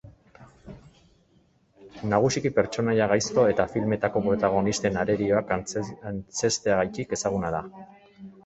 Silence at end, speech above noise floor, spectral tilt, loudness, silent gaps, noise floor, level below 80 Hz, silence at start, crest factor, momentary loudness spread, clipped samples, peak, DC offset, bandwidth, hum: 0.15 s; 38 dB; -5 dB/octave; -25 LUFS; none; -63 dBFS; -52 dBFS; 0.05 s; 20 dB; 10 LU; under 0.1%; -6 dBFS; under 0.1%; 8.2 kHz; none